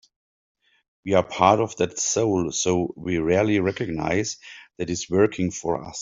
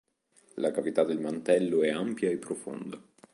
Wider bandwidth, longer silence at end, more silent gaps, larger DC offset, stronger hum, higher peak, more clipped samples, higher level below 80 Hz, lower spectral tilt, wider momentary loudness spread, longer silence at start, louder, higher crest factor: second, 7.8 kHz vs 11.5 kHz; second, 0 s vs 0.35 s; neither; neither; neither; first, -4 dBFS vs -12 dBFS; neither; first, -54 dBFS vs -76 dBFS; about the same, -4.5 dB/octave vs -5.5 dB/octave; second, 11 LU vs 15 LU; first, 1.05 s vs 0.55 s; first, -23 LUFS vs -29 LUFS; about the same, 20 dB vs 18 dB